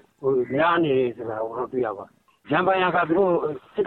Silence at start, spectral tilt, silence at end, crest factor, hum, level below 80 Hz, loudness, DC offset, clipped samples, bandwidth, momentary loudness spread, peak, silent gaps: 0.2 s; -8.5 dB/octave; 0 s; 16 dB; none; -62 dBFS; -23 LUFS; under 0.1%; under 0.1%; 4.2 kHz; 9 LU; -8 dBFS; none